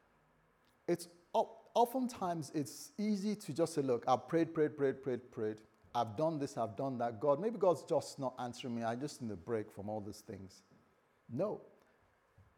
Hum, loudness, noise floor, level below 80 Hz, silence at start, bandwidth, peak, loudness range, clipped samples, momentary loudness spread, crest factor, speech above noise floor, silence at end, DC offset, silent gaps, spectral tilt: none; -38 LUFS; -72 dBFS; -80 dBFS; 0.9 s; 19.5 kHz; -18 dBFS; 7 LU; under 0.1%; 11 LU; 20 dB; 35 dB; 0.15 s; under 0.1%; none; -6 dB/octave